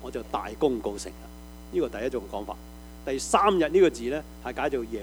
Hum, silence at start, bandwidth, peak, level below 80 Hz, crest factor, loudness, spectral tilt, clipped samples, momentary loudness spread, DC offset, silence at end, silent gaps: none; 0 s; over 20 kHz; -6 dBFS; -46 dBFS; 22 dB; -27 LUFS; -4.5 dB/octave; under 0.1%; 19 LU; under 0.1%; 0 s; none